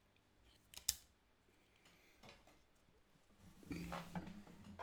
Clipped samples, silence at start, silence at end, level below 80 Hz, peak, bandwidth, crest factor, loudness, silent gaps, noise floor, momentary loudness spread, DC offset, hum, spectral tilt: under 0.1%; 0.05 s; 0 s; -70 dBFS; -16 dBFS; over 20 kHz; 38 dB; -48 LUFS; none; -75 dBFS; 25 LU; under 0.1%; none; -3 dB/octave